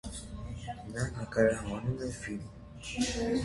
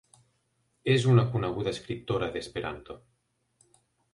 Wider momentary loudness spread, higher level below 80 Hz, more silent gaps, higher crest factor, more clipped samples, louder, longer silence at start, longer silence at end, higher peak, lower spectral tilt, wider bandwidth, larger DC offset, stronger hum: second, 14 LU vs 18 LU; first, -48 dBFS vs -56 dBFS; neither; about the same, 20 dB vs 22 dB; neither; second, -34 LUFS vs -28 LUFS; second, 0.05 s vs 0.85 s; second, 0 s vs 1.15 s; second, -14 dBFS vs -8 dBFS; second, -5 dB/octave vs -6.5 dB/octave; about the same, 11.5 kHz vs 11 kHz; neither; neither